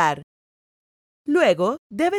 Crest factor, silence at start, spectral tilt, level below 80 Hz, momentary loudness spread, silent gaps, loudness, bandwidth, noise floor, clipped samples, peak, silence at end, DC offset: 18 dB; 0 s; -5 dB/octave; -66 dBFS; 15 LU; 0.23-1.25 s, 1.78-1.90 s; -21 LUFS; 15 kHz; under -90 dBFS; under 0.1%; -4 dBFS; 0 s; under 0.1%